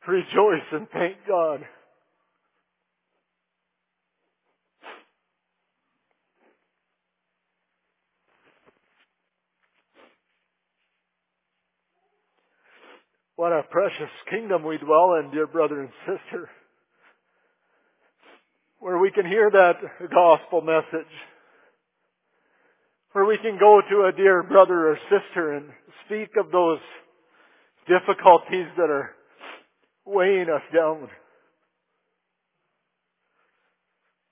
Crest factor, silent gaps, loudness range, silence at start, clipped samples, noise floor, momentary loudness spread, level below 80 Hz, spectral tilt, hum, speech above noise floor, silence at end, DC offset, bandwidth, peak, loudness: 24 dB; none; 12 LU; 0.05 s; under 0.1%; -80 dBFS; 17 LU; -84 dBFS; -9 dB/octave; none; 60 dB; 3.25 s; under 0.1%; 3.8 kHz; 0 dBFS; -21 LUFS